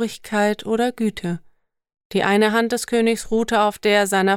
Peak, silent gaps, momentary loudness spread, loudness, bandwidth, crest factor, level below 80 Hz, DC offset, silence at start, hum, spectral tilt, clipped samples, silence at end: -4 dBFS; 2.05-2.10 s; 8 LU; -20 LUFS; 18 kHz; 16 dB; -52 dBFS; under 0.1%; 0 s; none; -4.5 dB/octave; under 0.1%; 0 s